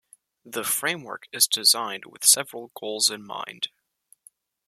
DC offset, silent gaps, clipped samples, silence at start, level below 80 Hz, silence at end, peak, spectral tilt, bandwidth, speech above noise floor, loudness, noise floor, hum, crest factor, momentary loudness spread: under 0.1%; none; under 0.1%; 0.45 s; -80 dBFS; 1 s; 0 dBFS; 0.5 dB/octave; 15.5 kHz; 37 dB; -22 LUFS; -62 dBFS; none; 26 dB; 17 LU